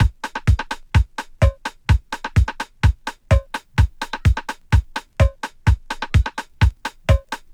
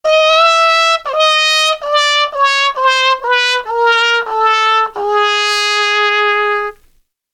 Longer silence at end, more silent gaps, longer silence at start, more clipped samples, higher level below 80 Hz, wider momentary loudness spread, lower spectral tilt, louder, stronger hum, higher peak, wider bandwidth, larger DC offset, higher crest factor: second, 0.2 s vs 0.6 s; neither; about the same, 0 s vs 0.05 s; neither; first, -22 dBFS vs -54 dBFS; about the same, 5 LU vs 5 LU; first, -6 dB/octave vs 2 dB/octave; second, -21 LUFS vs -11 LUFS; neither; about the same, -2 dBFS vs 0 dBFS; second, 11 kHz vs 17 kHz; neither; about the same, 16 dB vs 12 dB